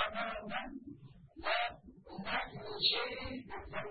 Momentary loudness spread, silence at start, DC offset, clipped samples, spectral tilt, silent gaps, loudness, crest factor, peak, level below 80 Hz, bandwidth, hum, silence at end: 21 LU; 0 s; 0.1%; under 0.1%; -0.5 dB/octave; none; -37 LUFS; 22 dB; -18 dBFS; -60 dBFS; 4.8 kHz; none; 0 s